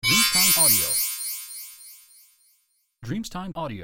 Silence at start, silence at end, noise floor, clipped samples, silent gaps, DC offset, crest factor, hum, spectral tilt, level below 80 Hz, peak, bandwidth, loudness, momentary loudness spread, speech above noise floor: 0.05 s; 0 s; -68 dBFS; under 0.1%; none; under 0.1%; 18 dB; none; -1 dB/octave; -52 dBFS; -6 dBFS; 17 kHz; -19 LUFS; 20 LU; 45 dB